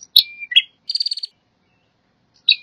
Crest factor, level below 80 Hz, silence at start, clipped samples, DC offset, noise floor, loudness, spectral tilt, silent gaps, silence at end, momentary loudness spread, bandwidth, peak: 22 dB; -80 dBFS; 0.15 s; under 0.1%; under 0.1%; -64 dBFS; -17 LUFS; 4 dB/octave; none; 0.05 s; 12 LU; 15.5 kHz; 0 dBFS